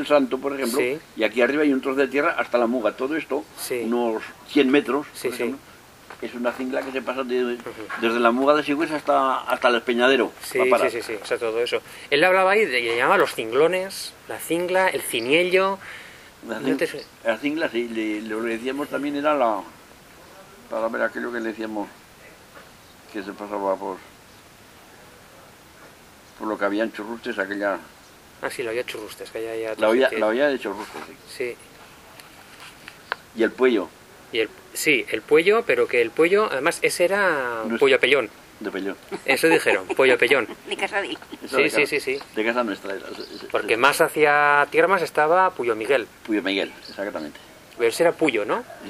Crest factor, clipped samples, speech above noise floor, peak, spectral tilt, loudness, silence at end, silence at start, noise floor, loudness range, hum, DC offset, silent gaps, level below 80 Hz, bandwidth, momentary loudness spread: 24 dB; under 0.1%; 26 dB; 0 dBFS; -3.5 dB/octave; -22 LUFS; 0 s; 0 s; -48 dBFS; 10 LU; none; under 0.1%; none; -62 dBFS; 16 kHz; 15 LU